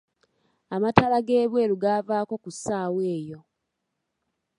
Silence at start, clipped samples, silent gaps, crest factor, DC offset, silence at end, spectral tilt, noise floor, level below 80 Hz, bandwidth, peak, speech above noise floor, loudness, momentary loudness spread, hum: 0.7 s; under 0.1%; none; 26 dB; under 0.1%; 1.2 s; -6 dB/octave; -80 dBFS; -58 dBFS; 11 kHz; 0 dBFS; 56 dB; -24 LUFS; 12 LU; none